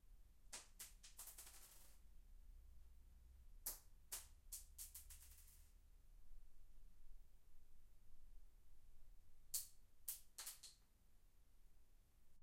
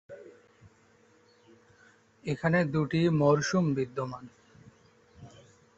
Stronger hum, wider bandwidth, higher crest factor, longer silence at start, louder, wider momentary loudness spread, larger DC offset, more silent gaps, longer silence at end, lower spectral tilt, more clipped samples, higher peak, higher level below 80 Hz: neither; first, 16 kHz vs 8 kHz; first, 30 dB vs 18 dB; about the same, 0 s vs 0.1 s; second, -55 LUFS vs -28 LUFS; about the same, 18 LU vs 19 LU; neither; neither; second, 0 s vs 0.5 s; second, -0.5 dB/octave vs -6.5 dB/octave; neither; second, -28 dBFS vs -12 dBFS; about the same, -66 dBFS vs -64 dBFS